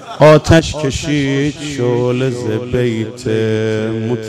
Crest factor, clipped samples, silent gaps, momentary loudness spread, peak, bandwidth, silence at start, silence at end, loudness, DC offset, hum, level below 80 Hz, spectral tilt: 14 dB; under 0.1%; none; 10 LU; 0 dBFS; 13.5 kHz; 0 s; 0 s; -14 LUFS; under 0.1%; none; -34 dBFS; -6 dB/octave